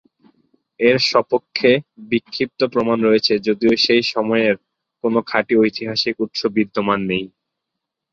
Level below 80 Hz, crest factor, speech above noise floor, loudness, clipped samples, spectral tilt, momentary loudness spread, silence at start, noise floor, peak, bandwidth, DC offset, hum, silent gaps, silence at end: -58 dBFS; 18 dB; 63 dB; -18 LUFS; under 0.1%; -5 dB/octave; 8 LU; 0.8 s; -81 dBFS; -2 dBFS; 7.8 kHz; under 0.1%; none; none; 0.85 s